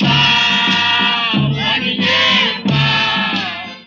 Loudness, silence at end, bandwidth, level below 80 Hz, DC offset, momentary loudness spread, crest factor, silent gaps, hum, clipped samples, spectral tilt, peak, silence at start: -13 LUFS; 0.05 s; 7.4 kHz; -44 dBFS; under 0.1%; 5 LU; 14 dB; none; none; under 0.1%; -4.5 dB/octave; -2 dBFS; 0 s